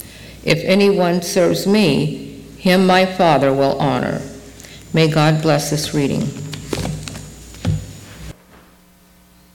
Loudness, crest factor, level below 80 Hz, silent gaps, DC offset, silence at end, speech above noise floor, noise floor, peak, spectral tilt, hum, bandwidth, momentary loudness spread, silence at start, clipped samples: -16 LUFS; 16 dB; -42 dBFS; none; under 0.1%; 1.2 s; 34 dB; -49 dBFS; -2 dBFS; -5.5 dB/octave; none; 17.5 kHz; 22 LU; 0 s; under 0.1%